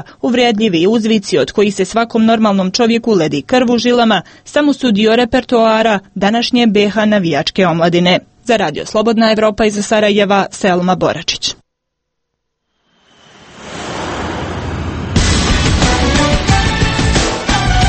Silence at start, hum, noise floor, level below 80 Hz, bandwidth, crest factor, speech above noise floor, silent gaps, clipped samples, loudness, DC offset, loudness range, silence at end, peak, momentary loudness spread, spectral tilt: 0 s; none; -72 dBFS; -26 dBFS; 8.8 kHz; 12 dB; 60 dB; none; under 0.1%; -13 LUFS; under 0.1%; 9 LU; 0 s; 0 dBFS; 8 LU; -5 dB/octave